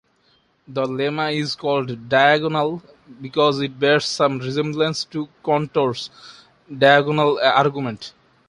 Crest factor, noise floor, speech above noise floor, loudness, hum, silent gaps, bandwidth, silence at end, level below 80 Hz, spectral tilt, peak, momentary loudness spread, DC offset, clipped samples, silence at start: 18 dB; -61 dBFS; 41 dB; -19 LUFS; none; none; 11 kHz; 0.4 s; -62 dBFS; -5 dB/octave; -2 dBFS; 15 LU; under 0.1%; under 0.1%; 0.7 s